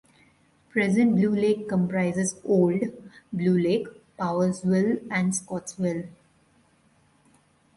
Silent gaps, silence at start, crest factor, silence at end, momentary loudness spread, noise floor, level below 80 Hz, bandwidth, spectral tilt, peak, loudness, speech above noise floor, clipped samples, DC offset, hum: none; 0.75 s; 16 dB; 1.65 s; 11 LU; -62 dBFS; -64 dBFS; 11.5 kHz; -6.5 dB/octave; -10 dBFS; -25 LUFS; 38 dB; under 0.1%; under 0.1%; none